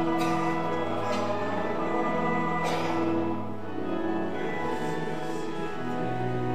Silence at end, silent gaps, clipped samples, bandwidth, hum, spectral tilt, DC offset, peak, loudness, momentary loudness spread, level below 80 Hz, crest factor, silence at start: 0 s; none; under 0.1%; 15 kHz; none; -6.5 dB/octave; 2%; -14 dBFS; -30 LUFS; 6 LU; -60 dBFS; 14 dB; 0 s